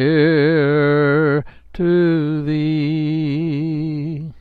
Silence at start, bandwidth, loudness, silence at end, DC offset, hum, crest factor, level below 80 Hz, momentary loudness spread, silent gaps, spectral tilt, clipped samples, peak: 0 s; 4.8 kHz; -17 LUFS; 0 s; under 0.1%; none; 14 dB; -46 dBFS; 8 LU; none; -10 dB/octave; under 0.1%; -4 dBFS